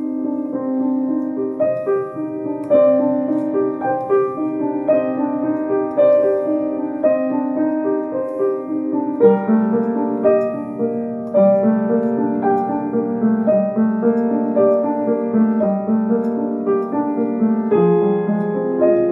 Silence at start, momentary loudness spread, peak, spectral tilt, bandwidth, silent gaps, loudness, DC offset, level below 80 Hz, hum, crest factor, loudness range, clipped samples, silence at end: 0 s; 7 LU; -2 dBFS; -11 dB/octave; 3.8 kHz; none; -18 LUFS; under 0.1%; -68 dBFS; none; 16 dB; 2 LU; under 0.1%; 0 s